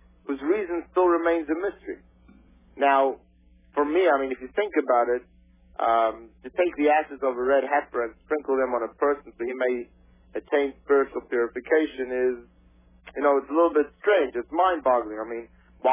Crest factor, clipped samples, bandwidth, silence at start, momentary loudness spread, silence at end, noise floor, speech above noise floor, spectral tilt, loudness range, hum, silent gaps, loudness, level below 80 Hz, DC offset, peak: 16 dB; under 0.1%; 3.8 kHz; 0.3 s; 13 LU; 0 s; -57 dBFS; 33 dB; -8 dB/octave; 2 LU; none; none; -25 LUFS; -58 dBFS; under 0.1%; -8 dBFS